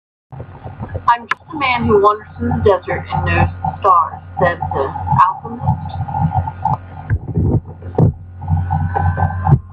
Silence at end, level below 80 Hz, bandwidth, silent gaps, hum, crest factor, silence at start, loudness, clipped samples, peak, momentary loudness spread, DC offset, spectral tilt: 0 s; -36 dBFS; 5.2 kHz; none; none; 16 dB; 0.3 s; -17 LUFS; under 0.1%; 0 dBFS; 10 LU; under 0.1%; -9 dB/octave